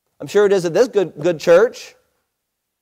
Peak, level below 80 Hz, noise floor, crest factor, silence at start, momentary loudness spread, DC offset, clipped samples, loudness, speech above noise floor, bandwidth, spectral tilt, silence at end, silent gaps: -4 dBFS; -64 dBFS; -76 dBFS; 14 dB; 0.2 s; 7 LU; under 0.1%; under 0.1%; -16 LUFS; 61 dB; 15 kHz; -5 dB/octave; 0.95 s; none